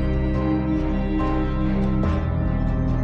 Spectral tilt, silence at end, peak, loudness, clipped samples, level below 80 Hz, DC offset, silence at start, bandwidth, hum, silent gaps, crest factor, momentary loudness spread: -9.5 dB/octave; 0 s; -12 dBFS; -23 LUFS; under 0.1%; -26 dBFS; under 0.1%; 0 s; 6.2 kHz; none; none; 10 dB; 1 LU